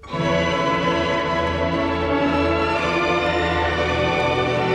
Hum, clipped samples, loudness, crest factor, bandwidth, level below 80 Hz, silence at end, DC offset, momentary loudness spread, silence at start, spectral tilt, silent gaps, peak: none; under 0.1%; -20 LUFS; 12 dB; 10.5 kHz; -38 dBFS; 0 s; under 0.1%; 2 LU; 0.05 s; -5.5 dB/octave; none; -8 dBFS